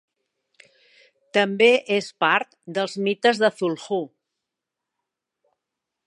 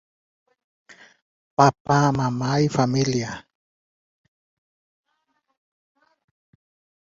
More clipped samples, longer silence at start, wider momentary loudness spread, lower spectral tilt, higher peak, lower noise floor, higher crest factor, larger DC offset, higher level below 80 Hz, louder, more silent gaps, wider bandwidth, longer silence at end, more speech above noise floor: neither; second, 1.35 s vs 1.6 s; about the same, 11 LU vs 11 LU; second, -4.5 dB/octave vs -6 dB/octave; about the same, -4 dBFS vs -2 dBFS; first, -85 dBFS vs -73 dBFS; about the same, 20 dB vs 24 dB; neither; second, -80 dBFS vs -58 dBFS; about the same, -21 LUFS vs -21 LUFS; second, none vs 1.80-1.85 s; first, 11.5 kHz vs 7.8 kHz; second, 2 s vs 3.65 s; first, 63 dB vs 53 dB